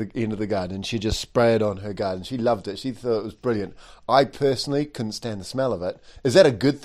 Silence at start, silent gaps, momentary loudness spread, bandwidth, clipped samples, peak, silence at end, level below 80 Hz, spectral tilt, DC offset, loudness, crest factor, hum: 0 s; none; 11 LU; 14.5 kHz; under 0.1%; -2 dBFS; 0 s; -46 dBFS; -5.5 dB/octave; under 0.1%; -23 LUFS; 20 dB; none